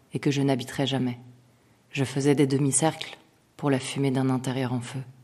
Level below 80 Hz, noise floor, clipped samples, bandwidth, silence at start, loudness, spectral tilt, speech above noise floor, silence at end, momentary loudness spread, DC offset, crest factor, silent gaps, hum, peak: -66 dBFS; -60 dBFS; under 0.1%; 13.5 kHz; 0.15 s; -26 LUFS; -5 dB/octave; 34 dB; 0.1 s; 13 LU; under 0.1%; 18 dB; none; none; -8 dBFS